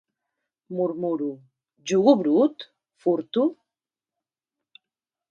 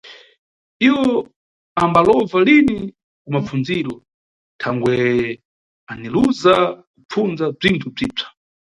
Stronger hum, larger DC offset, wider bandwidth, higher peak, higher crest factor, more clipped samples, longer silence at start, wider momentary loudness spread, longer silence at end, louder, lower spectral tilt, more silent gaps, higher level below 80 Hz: neither; neither; second, 9 kHz vs 11 kHz; second, -4 dBFS vs 0 dBFS; about the same, 22 dB vs 18 dB; neither; first, 0.7 s vs 0.05 s; about the same, 20 LU vs 19 LU; first, 1.8 s vs 0.4 s; second, -23 LUFS vs -17 LUFS; about the same, -6.5 dB/octave vs -6.5 dB/octave; second, none vs 0.38-0.80 s, 1.36-1.76 s, 3.04-3.25 s, 4.14-4.59 s, 5.45-5.87 s, 6.87-6.94 s, 7.05-7.09 s; second, -76 dBFS vs -50 dBFS